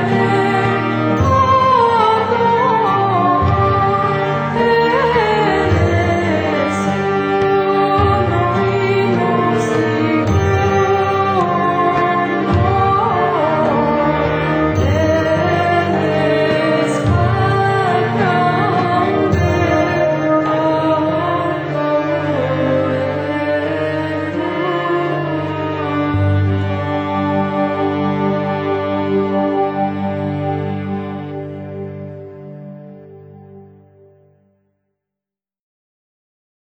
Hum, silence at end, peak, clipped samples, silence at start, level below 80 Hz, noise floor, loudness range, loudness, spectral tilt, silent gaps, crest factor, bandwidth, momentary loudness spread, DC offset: none; 3.05 s; -2 dBFS; under 0.1%; 0 s; -38 dBFS; -87 dBFS; 6 LU; -15 LUFS; -7 dB/octave; none; 14 dB; over 20 kHz; 6 LU; under 0.1%